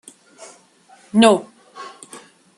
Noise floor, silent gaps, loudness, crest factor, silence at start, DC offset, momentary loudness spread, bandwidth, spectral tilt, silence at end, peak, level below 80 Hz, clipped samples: -51 dBFS; none; -16 LUFS; 20 dB; 1.15 s; under 0.1%; 25 LU; 11.5 kHz; -4.5 dB/octave; 0.4 s; -2 dBFS; -66 dBFS; under 0.1%